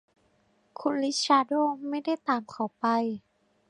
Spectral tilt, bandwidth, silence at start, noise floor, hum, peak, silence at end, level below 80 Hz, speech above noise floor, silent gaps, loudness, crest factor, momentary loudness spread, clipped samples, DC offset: -3.5 dB/octave; 11 kHz; 0.8 s; -68 dBFS; none; -8 dBFS; 0.5 s; -78 dBFS; 40 dB; none; -28 LUFS; 20 dB; 11 LU; under 0.1%; under 0.1%